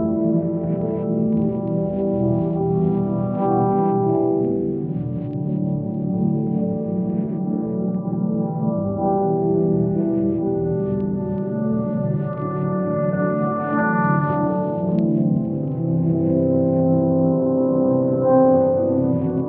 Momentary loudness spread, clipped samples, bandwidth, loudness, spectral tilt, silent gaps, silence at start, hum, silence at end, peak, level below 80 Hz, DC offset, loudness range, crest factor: 6 LU; under 0.1%; 3 kHz; -20 LUFS; -11.5 dB/octave; none; 0 s; none; 0 s; -6 dBFS; -52 dBFS; under 0.1%; 4 LU; 14 dB